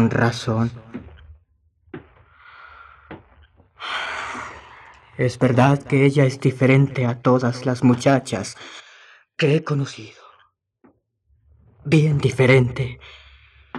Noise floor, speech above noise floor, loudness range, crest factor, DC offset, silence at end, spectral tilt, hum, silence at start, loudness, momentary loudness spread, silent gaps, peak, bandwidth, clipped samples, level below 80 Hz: -64 dBFS; 45 dB; 15 LU; 20 dB; under 0.1%; 0 s; -7 dB/octave; none; 0 s; -19 LUFS; 24 LU; none; -2 dBFS; 11 kHz; under 0.1%; -52 dBFS